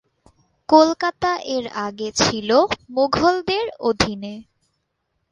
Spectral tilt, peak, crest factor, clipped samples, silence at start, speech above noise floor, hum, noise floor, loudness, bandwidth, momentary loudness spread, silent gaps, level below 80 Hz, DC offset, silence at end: -4 dB/octave; 0 dBFS; 20 dB; under 0.1%; 0.7 s; 54 dB; none; -73 dBFS; -19 LUFS; 11 kHz; 13 LU; none; -48 dBFS; under 0.1%; 0.9 s